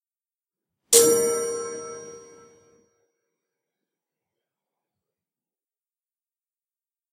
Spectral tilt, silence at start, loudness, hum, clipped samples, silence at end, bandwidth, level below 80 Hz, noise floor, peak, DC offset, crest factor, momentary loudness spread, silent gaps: -1 dB/octave; 0.9 s; -19 LUFS; none; under 0.1%; 4.95 s; 16 kHz; -74 dBFS; under -90 dBFS; 0 dBFS; under 0.1%; 28 dB; 22 LU; none